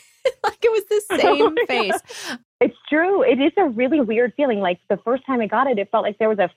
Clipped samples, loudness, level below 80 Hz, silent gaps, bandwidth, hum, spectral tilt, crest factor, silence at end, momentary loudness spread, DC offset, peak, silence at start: under 0.1%; -19 LUFS; -64 dBFS; 2.45-2.59 s; 15.5 kHz; none; -4.5 dB/octave; 14 dB; 0.1 s; 6 LU; under 0.1%; -4 dBFS; 0.25 s